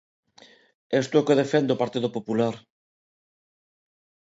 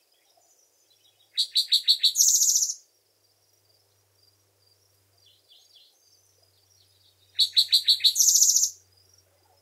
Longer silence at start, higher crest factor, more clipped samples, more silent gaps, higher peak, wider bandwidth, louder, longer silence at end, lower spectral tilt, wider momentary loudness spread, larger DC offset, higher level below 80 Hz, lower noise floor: second, 0.9 s vs 1.35 s; about the same, 20 dB vs 22 dB; neither; neither; about the same, -6 dBFS vs -4 dBFS; second, 8 kHz vs 16 kHz; second, -24 LUFS vs -19 LUFS; first, 1.7 s vs 0.9 s; first, -6 dB/octave vs 6 dB/octave; second, 8 LU vs 11 LU; neither; first, -72 dBFS vs under -90 dBFS; second, -55 dBFS vs -67 dBFS